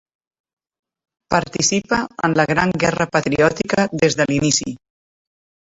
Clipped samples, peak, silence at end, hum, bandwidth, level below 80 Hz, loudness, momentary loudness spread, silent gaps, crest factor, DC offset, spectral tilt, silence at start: under 0.1%; -2 dBFS; 0.9 s; none; 8 kHz; -48 dBFS; -18 LUFS; 5 LU; none; 18 dB; under 0.1%; -4 dB/octave; 1.3 s